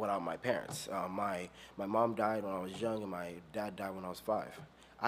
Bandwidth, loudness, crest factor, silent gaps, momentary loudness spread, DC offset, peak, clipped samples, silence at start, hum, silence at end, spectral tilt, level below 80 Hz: 15.5 kHz; -38 LUFS; 22 dB; none; 11 LU; under 0.1%; -16 dBFS; under 0.1%; 0 s; none; 0 s; -5 dB/octave; -70 dBFS